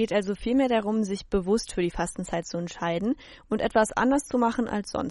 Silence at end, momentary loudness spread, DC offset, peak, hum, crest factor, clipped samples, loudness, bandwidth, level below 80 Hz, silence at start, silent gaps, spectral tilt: 0 s; 8 LU; under 0.1%; -10 dBFS; none; 16 dB; under 0.1%; -27 LUFS; 11.5 kHz; -46 dBFS; 0 s; none; -5 dB/octave